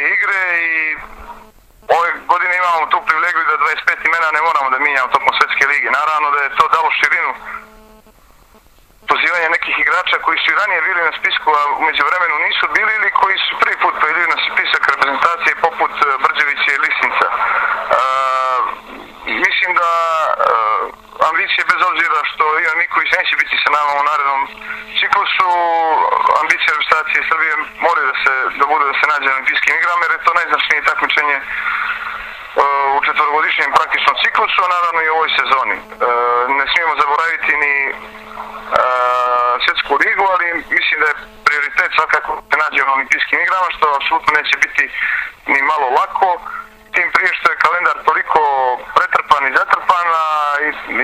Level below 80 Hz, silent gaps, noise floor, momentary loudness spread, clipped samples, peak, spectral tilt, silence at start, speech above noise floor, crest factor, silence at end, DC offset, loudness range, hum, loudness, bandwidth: -52 dBFS; none; -47 dBFS; 5 LU; under 0.1%; 0 dBFS; -1.5 dB/octave; 0 s; 32 dB; 16 dB; 0 s; under 0.1%; 2 LU; none; -14 LUFS; 15.5 kHz